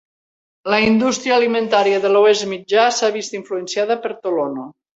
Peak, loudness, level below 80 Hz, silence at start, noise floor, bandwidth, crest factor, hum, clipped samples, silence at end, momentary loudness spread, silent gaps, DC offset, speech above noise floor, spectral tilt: -2 dBFS; -17 LUFS; -56 dBFS; 0.65 s; under -90 dBFS; 8 kHz; 16 dB; none; under 0.1%; 0.25 s; 11 LU; none; under 0.1%; over 73 dB; -3.5 dB/octave